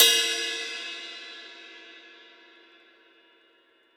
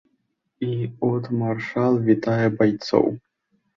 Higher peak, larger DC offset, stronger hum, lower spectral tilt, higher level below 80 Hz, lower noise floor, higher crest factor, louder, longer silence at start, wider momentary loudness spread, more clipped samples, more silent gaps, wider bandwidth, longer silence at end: second, -6 dBFS vs -2 dBFS; neither; neither; second, 3.5 dB/octave vs -8 dB/octave; second, under -90 dBFS vs -60 dBFS; second, -63 dBFS vs -72 dBFS; about the same, 24 dB vs 20 dB; second, -26 LUFS vs -22 LUFS; second, 0 s vs 0.6 s; first, 25 LU vs 8 LU; neither; neither; first, over 20 kHz vs 7.2 kHz; first, 1.9 s vs 0.6 s